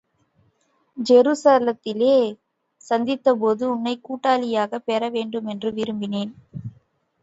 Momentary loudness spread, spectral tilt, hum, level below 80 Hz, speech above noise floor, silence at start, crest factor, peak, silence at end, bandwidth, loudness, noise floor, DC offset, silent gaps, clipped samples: 15 LU; -5.5 dB/octave; none; -66 dBFS; 45 dB; 0.95 s; 18 dB; -4 dBFS; 0.5 s; 8 kHz; -21 LUFS; -65 dBFS; under 0.1%; none; under 0.1%